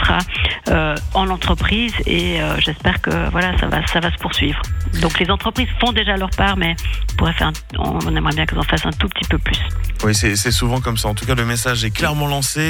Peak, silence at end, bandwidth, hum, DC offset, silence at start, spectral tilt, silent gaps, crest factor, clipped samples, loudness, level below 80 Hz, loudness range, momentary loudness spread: -4 dBFS; 0 s; 19 kHz; none; under 0.1%; 0 s; -4 dB/octave; none; 14 dB; under 0.1%; -18 LUFS; -24 dBFS; 1 LU; 4 LU